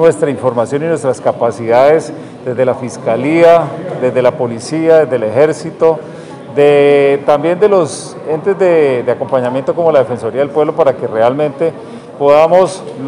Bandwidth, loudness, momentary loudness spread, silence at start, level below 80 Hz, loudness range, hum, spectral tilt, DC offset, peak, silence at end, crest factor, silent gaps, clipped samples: 11 kHz; -12 LUFS; 11 LU; 0 s; -58 dBFS; 2 LU; none; -6 dB/octave; under 0.1%; 0 dBFS; 0 s; 12 dB; none; 0.9%